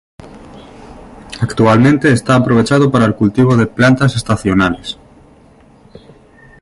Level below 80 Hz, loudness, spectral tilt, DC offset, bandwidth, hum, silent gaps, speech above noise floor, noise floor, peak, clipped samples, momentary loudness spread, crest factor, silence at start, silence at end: -40 dBFS; -12 LUFS; -6.5 dB/octave; under 0.1%; 11.5 kHz; none; none; 33 dB; -44 dBFS; 0 dBFS; under 0.1%; 12 LU; 12 dB; 0.2 s; 1.7 s